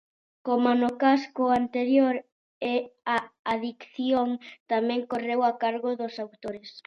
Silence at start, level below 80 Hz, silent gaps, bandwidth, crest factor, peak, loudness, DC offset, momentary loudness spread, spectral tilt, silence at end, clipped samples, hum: 0.45 s; -70 dBFS; 2.32-2.61 s, 3.39-3.45 s, 4.60-4.66 s; 6.8 kHz; 18 dB; -8 dBFS; -27 LUFS; under 0.1%; 13 LU; -5.5 dB/octave; 0.05 s; under 0.1%; none